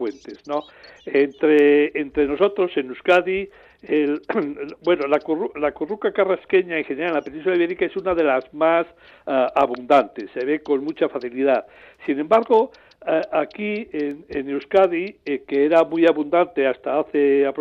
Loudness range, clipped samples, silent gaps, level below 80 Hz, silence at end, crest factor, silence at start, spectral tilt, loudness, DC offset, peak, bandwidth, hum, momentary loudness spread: 3 LU; under 0.1%; none; -58 dBFS; 0 s; 16 dB; 0 s; -6.5 dB/octave; -21 LUFS; under 0.1%; -4 dBFS; 7.4 kHz; none; 11 LU